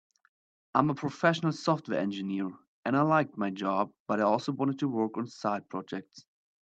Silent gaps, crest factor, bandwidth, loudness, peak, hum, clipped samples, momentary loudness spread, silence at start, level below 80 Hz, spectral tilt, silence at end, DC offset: 2.68-2.83 s, 4.00-4.06 s; 22 dB; 8.2 kHz; -30 LUFS; -8 dBFS; none; under 0.1%; 10 LU; 0.75 s; -76 dBFS; -6.5 dB/octave; 0.4 s; under 0.1%